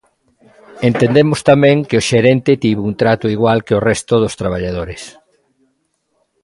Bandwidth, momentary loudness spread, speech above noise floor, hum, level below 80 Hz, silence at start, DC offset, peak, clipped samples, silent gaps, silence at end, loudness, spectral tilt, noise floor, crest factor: 11.5 kHz; 10 LU; 52 dB; none; -42 dBFS; 0.75 s; under 0.1%; 0 dBFS; under 0.1%; none; 1.35 s; -14 LUFS; -6 dB/octave; -65 dBFS; 14 dB